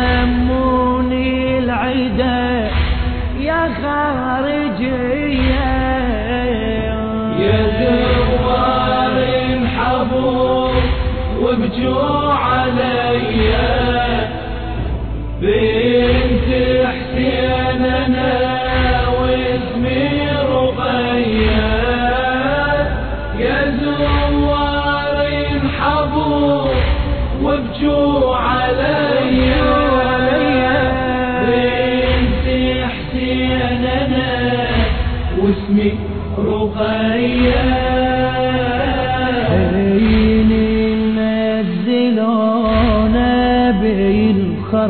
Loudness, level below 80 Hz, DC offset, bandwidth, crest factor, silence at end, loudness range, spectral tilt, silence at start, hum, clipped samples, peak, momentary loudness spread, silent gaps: -16 LUFS; -24 dBFS; 0.8%; 4.5 kHz; 12 dB; 0 s; 3 LU; -10 dB/octave; 0 s; none; under 0.1%; -2 dBFS; 5 LU; none